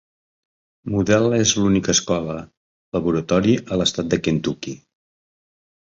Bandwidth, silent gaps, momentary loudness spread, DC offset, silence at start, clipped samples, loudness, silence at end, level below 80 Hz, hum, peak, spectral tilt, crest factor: 7.8 kHz; 2.57-2.92 s; 14 LU; under 0.1%; 0.85 s; under 0.1%; -20 LUFS; 1.1 s; -46 dBFS; none; -2 dBFS; -4.5 dB/octave; 18 dB